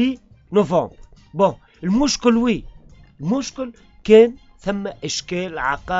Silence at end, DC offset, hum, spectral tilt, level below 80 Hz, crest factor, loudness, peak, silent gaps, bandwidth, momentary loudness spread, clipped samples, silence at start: 0 s; under 0.1%; none; -4.5 dB/octave; -44 dBFS; 20 dB; -19 LUFS; 0 dBFS; none; 8 kHz; 18 LU; under 0.1%; 0 s